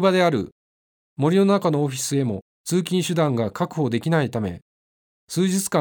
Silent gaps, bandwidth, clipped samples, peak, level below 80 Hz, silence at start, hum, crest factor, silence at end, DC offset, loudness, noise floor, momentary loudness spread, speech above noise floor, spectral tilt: 0.52-1.16 s, 2.42-2.64 s, 4.62-5.27 s; over 20 kHz; under 0.1%; -4 dBFS; -60 dBFS; 0 s; none; 18 dB; 0 s; under 0.1%; -22 LUFS; under -90 dBFS; 12 LU; over 69 dB; -5.5 dB/octave